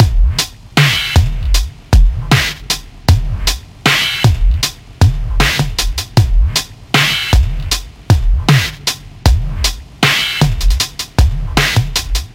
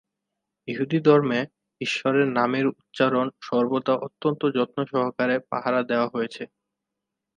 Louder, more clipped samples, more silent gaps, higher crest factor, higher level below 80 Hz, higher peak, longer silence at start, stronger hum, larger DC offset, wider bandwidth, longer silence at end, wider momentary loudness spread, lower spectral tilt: first, -14 LUFS vs -24 LUFS; neither; neither; second, 12 dB vs 20 dB; first, -16 dBFS vs -74 dBFS; first, 0 dBFS vs -4 dBFS; second, 0 s vs 0.65 s; neither; neither; first, 16.5 kHz vs 9.8 kHz; second, 0.05 s vs 0.9 s; second, 7 LU vs 11 LU; second, -4 dB/octave vs -6.5 dB/octave